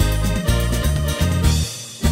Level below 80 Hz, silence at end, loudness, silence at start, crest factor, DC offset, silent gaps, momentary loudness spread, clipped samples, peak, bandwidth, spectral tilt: -22 dBFS; 0 s; -20 LUFS; 0 s; 14 dB; under 0.1%; none; 4 LU; under 0.1%; -4 dBFS; 16.5 kHz; -5 dB/octave